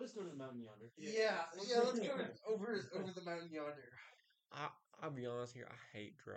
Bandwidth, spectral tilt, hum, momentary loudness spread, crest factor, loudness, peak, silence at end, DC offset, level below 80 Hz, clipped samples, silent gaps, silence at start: 9 kHz; -4.5 dB/octave; none; 17 LU; 20 dB; -44 LUFS; -24 dBFS; 0 s; under 0.1%; under -90 dBFS; under 0.1%; none; 0 s